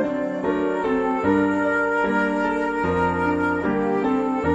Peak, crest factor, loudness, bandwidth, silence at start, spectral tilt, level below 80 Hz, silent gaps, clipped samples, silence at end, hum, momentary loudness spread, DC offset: -8 dBFS; 14 dB; -22 LUFS; 8.4 kHz; 0 s; -7.5 dB/octave; -50 dBFS; none; under 0.1%; 0 s; none; 3 LU; under 0.1%